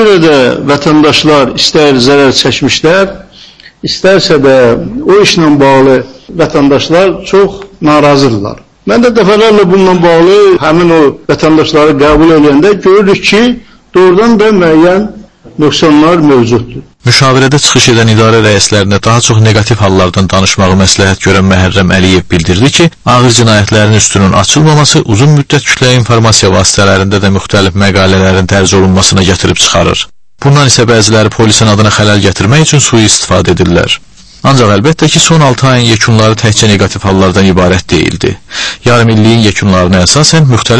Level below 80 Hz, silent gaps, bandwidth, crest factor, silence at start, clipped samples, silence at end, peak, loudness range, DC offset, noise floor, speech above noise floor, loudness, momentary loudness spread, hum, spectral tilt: -30 dBFS; none; 11 kHz; 6 dB; 0 s; 5%; 0 s; 0 dBFS; 2 LU; under 0.1%; -34 dBFS; 29 dB; -5 LUFS; 5 LU; none; -4.5 dB/octave